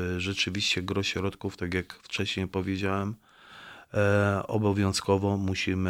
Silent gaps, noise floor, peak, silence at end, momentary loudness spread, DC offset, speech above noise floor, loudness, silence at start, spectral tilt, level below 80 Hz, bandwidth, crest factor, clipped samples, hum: none; -49 dBFS; -10 dBFS; 0 s; 10 LU; under 0.1%; 21 dB; -28 LUFS; 0 s; -5 dB/octave; -56 dBFS; 15 kHz; 18 dB; under 0.1%; none